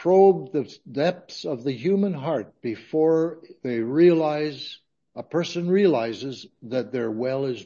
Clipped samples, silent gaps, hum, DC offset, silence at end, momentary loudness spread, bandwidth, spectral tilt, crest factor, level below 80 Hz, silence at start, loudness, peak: under 0.1%; none; none; under 0.1%; 0 s; 16 LU; 7.2 kHz; -7 dB/octave; 18 dB; -74 dBFS; 0 s; -24 LUFS; -6 dBFS